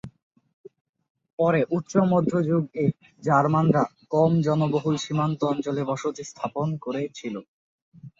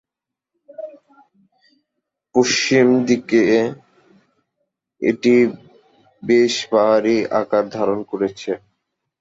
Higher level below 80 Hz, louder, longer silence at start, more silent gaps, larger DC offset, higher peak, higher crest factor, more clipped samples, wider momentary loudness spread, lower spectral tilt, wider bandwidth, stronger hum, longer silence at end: about the same, -62 dBFS vs -62 dBFS; second, -24 LUFS vs -17 LUFS; second, 0.05 s vs 0.8 s; first, 0.23-0.31 s, 0.53-0.64 s, 0.81-0.93 s, 1.10-1.15 s, 1.33-1.38 s, 7.48-7.92 s vs none; neither; second, -6 dBFS vs -2 dBFS; about the same, 20 dB vs 16 dB; neither; second, 11 LU vs 14 LU; first, -7.5 dB/octave vs -4.5 dB/octave; about the same, 7.6 kHz vs 7.8 kHz; neither; second, 0.1 s vs 0.65 s